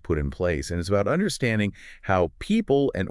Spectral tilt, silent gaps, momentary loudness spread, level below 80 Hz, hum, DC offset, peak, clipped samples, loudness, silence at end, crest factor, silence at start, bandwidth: -6 dB/octave; none; 6 LU; -42 dBFS; none; under 0.1%; -8 dBFS; under 0.1%; -25 LUFS; 0 s; 16 dB; 0.05 s; 12 kHz